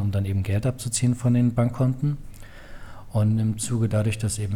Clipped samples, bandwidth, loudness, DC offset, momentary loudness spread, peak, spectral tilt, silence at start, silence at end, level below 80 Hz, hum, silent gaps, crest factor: under 0.1%; 14.5 kHz; -24 LUFS; under 0.1%; 7 LU; -10 dBFS; -6.5 dB/octave; 0 s; 0 s; -44 dBFS; none; none; 14 dB